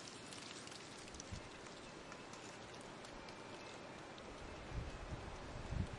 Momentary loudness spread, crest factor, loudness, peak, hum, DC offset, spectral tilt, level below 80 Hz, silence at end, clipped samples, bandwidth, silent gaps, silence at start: 4 LU; 22 dB; -51 LUFS; -28 dBFS; none; under 0.1%; -4.5 dB/octave; -56 dBFS; 0 s; under 0.1%; 11.5 kHz; none; 0 s